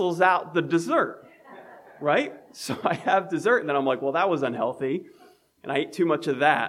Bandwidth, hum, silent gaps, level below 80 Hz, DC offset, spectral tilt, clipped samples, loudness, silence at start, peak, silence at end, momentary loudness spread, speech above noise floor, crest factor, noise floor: 15 kHz; none; none; -78 dBFS; under 0.1%; -5.5 dB/octave; under 0.1%; -25 LUFS; 0 s; -6 dBFS; 0 s; 9 LU; 23 dB; 20 dB; -47 dBFS